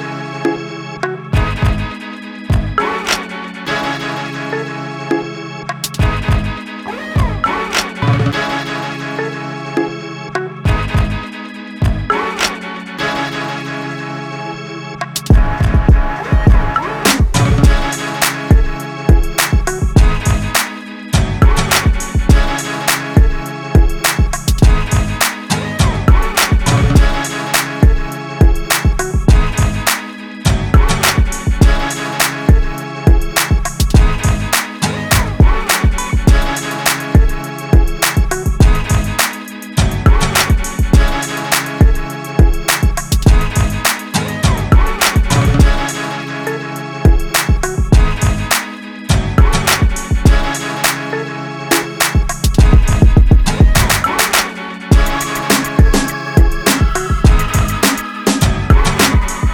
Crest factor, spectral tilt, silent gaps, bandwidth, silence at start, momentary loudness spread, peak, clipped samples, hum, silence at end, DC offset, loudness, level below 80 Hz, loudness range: 12 dB; -4.5 dB/octave; none; over 20 kHz; 0 s; 10 LU; 0 dBFS; under 0.1%; none; 0 s; under 0.1%; -14 LUFS; -16 dBFS; 6 LU